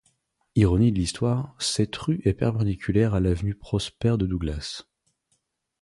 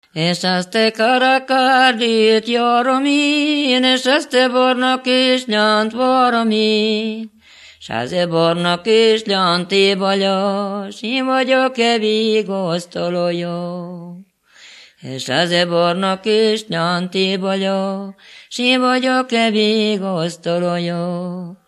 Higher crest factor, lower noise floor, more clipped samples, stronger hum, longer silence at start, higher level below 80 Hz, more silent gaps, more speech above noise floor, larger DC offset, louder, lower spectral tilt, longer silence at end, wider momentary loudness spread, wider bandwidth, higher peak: about the same, 18 dB vs 16 dB; first, -73 dBFS vs -45 dBFS; neither; neither; first, 0.55 s vs 0.15 s; first, -38 dBFS vs -66 dBFS; neither; first, 50 dB vs 29 dB; neither; second, -25 LUFS vs -16 LUFS; first, -6 dB/octave vs -4.5 dB/octave; first, 1 s vs 0.15 s; second, 8 LU vs 11 LU; about the same, 11.5 kHz vs 12.5 kHz; second, -8 dBFS vs 0 dBFS